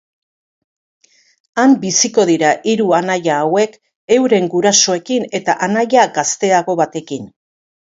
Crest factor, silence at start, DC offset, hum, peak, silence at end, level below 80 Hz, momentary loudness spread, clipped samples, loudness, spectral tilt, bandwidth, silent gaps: 16 dB; 1.55 s; under 0.1%; none; 0 dBFS; 0.7 s; -64 dBFS; 7 LU; under 0.1%; -14 LUFS; -3 dB/octave; 7.8 kHz; 3.96-4.08 s